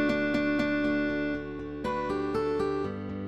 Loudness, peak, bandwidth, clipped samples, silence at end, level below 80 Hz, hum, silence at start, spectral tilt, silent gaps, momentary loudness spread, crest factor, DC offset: -30 LUFS; -14 dBFS; 9.2 kHz; under 0.1%; 0 s; -50 dBFS; none; 0 s; -7 dB/octave; none; 8 LU; 16 dB; 0.2%